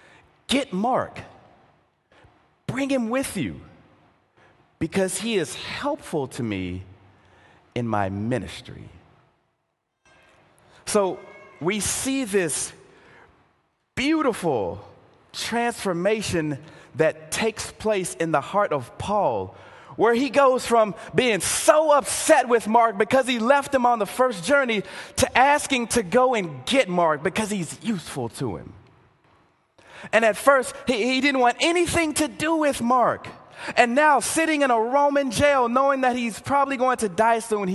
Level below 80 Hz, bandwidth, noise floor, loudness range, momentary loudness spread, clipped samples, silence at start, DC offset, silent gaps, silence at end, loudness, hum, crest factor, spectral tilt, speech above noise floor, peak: -52 dBFS; 13 kHz; -76 dBFS; 11 LU; 13 LU; under 0.1%; 0.5 s; under 0.1%; none; 0 s; -22 LUFS; none; 22 dB; -4 dB/octave; 54 dB; 0 dBFS